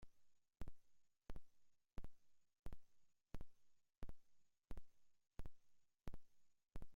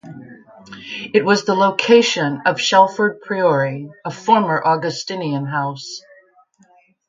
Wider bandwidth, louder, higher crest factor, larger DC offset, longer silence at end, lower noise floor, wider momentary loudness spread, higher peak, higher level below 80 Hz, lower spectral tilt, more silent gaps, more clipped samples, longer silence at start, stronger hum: second, 7.2 kHz vs 9 kHz; second, -65 LUFS vs -17 LUFS; about the same, 14 dB vs 18 dB; neither; second, 0 s vs 1.1 s; first, -72 dBFS vs -54 dBFS; second, 5 LU vs 17 LU; second, -38 dBFS vs 0 dBFS; about the same, -62 dBFS vs -66 dBFS; first, -6.5 dB/octave vs -4.5 dB/octave; first, 2.59-2.63 s vs none; neither; about the same, 0 s vs 0.05 s; neither